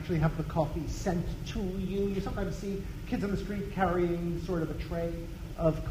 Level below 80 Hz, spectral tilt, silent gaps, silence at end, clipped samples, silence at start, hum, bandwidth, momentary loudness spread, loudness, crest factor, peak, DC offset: -40 dBFS; -7 dB/octave; none; 0 s; under 0.1%; 0 s; none; 15.5 kHz; 7 LU; -33 LUFS; 18 dB; -12 dBFS; under 0.1%